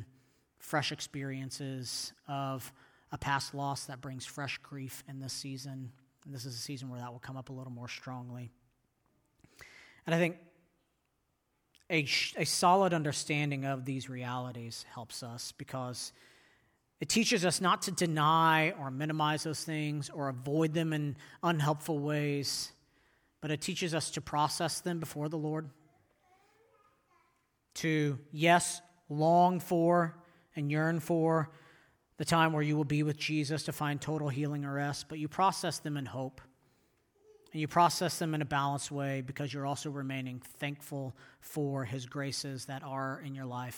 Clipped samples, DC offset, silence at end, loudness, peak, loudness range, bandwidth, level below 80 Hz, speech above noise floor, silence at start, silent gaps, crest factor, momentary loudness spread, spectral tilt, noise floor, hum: under 0.1%; under 0.1%; 0 s; -33 LUFS; -12 dBFS; 11 LU; over 20 kHz; -70 dBFS; 46 dB; 0 s; none; 22 dB; 16 LU; -4.5 dB/octave; -79 dBFS; none